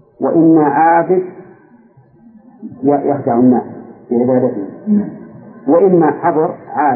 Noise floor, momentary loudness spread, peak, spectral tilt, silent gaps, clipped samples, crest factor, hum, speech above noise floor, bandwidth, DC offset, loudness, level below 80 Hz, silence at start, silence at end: -46 dBFS; 18 LU; 0 dBFS; -15.5 dB/octave; none; under 0.1%; 12 dB; none; 34 dB; 2.6 kHz; under 0.1%; -13 LUFS; -64 dBFS; 0.2 s; 0 s